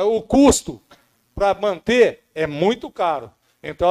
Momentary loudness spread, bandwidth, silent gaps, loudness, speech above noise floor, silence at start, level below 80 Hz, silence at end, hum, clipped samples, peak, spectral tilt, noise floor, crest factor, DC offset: 20 LU; 14.5 kHz; none; -19 LUFS; 36 dB; 0 s; -40 dBFS; 0 s; none; under 0.1%; -4 dBFS; -4.5 dB/octave; -54 dBFS; 16 dB; under 0.1%